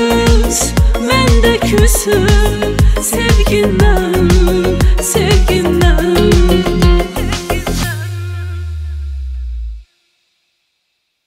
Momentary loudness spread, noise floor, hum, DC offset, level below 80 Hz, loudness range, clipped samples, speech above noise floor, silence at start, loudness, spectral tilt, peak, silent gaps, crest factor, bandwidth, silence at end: 13 LU; -67 dBFS; none; under 0.1%; -16 dBFS; 10 LU; under 0.1%; 56 dB; 0 s; -12 LUFS; -5 dB/octave; 0 dBFS; none; 12 dB; 16 kHz; 1.45 s